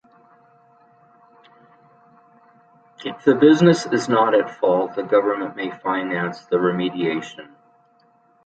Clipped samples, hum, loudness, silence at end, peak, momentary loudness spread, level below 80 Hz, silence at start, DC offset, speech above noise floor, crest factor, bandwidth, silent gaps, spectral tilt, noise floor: under 0.1%; none; -19 LUFS; 1 s; -2 dBFS; 14 LU; -68 dBFS; 3 s; under 0.1%; 39 dB; 20 dB; 9 kHz; none; -6 dB/octave; -58 dBFS